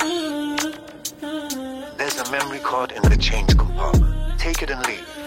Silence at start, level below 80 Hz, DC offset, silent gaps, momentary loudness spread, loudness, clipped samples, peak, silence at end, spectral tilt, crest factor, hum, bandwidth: 0 s; -24 dBFS; under 0.1%; none; 11 LU; -22 LUFS; under 0.1%; -4 dBFS; 0 s; -4.5 dB/octave; 16 dB; none; 16.5 kHz